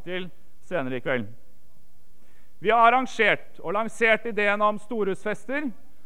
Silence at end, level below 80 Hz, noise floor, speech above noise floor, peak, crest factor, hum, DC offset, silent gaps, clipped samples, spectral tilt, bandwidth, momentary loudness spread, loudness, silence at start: 0.35 s; -60 dBFS; -59 dBFS; 35 dB; -6 dBFS; 20 dB; 50 Hz at -60 dBFS; 2%; none; under 0.1%; -5 dB/octave; 15.5 kHz; 14 LU; -24 LUFS; 0.05 s